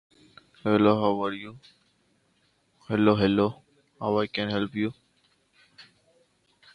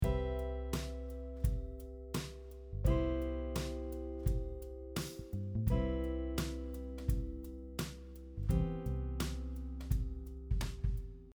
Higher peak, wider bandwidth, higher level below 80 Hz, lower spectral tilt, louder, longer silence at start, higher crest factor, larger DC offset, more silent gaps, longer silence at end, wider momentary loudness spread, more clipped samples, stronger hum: first, -6 dBFS vs -20 dBFS; second, 9.4 kHz vs over 20 kHz; second, -60 dBFS vs -40 dBFS; first, -8 dB/octave vs -6.5 dB/octave; first, -26 LUFS vs -40 LUFS; first, 0.65 s vs 0 s; about the same, 22 dB vs 18 dB; neither; neither; first, 0.9 s vs 0 s; about the same, 12 LU vs 10 LU; neither; neither